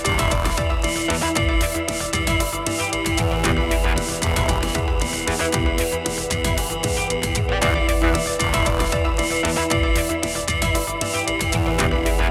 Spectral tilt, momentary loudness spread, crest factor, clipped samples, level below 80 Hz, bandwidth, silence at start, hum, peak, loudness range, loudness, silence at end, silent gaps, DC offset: -4 dB/octave; 3 LU; 16 dB; under 0.1%; -26 dBFS; 16 kHz; 0 s; none; -4 dBFS; 1 LU; -21 LUFS; 0 s; none; under 0.1%